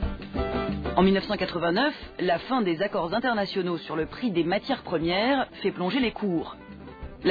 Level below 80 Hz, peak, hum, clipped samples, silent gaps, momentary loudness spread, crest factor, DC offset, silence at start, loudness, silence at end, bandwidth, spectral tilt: -42 dBFS; -8 dBFS; none; under 0.1%; none; 8 LU; 18 dB; under 0.1%; 0 s; -26 LUFS; 0 s; 5 kHz; -8 dB/octave